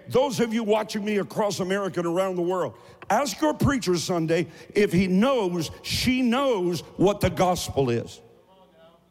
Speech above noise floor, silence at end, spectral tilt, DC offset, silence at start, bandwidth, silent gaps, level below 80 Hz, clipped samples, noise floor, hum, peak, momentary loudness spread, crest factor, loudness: 31 dB; 0.95 s; -5.5 dB/octave; under 0.1%; 0.05 s; 16.5 kHz; none; -50 dBFS; under 0.1%; -55 dBFS; none; -12 dBFS; 6 LU; 12 dB; -24 LUFS